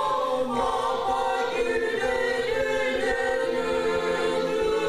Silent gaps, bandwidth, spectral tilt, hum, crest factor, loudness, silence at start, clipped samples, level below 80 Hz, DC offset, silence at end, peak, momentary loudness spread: none; 15.5 kHz; -3.5 dB/octave; none; 12 dB; -25 LUFS; 0 s; under 0.1%; -48 dBFS; under 0.1%; 0 s; -12 dBFS; 1 LU